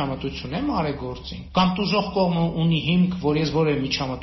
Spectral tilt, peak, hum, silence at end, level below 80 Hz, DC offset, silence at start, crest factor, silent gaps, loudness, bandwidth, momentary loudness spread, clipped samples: -5 dB/octave; -6 dBFS; none; 0 s; -42 dBFS; under 0.1%; 0 s; 16 dB; none; -23 LUFS; 6 kHz; 8 LU; under 0.1%